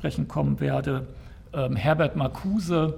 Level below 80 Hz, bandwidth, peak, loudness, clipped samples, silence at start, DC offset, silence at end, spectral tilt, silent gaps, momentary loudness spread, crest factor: -44 dBFS; 14 kHz; -10 dBFS; -26 LUFS; under 0.1%; 0 s; under 0.1%; 0 s; -7.5 dB/octave; none; 11 LU; 16 dB